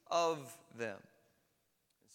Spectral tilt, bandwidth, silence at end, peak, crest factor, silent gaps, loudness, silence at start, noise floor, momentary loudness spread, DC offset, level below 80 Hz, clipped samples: -3.5 dB/octave; 17 kHz; 1.15 s; -22 dBFS; 20 dB; none; -39 LUFS; 0.1 s; -80 dBFS; 18 LU; under 0.1%; -90 dBFS; under 0.1%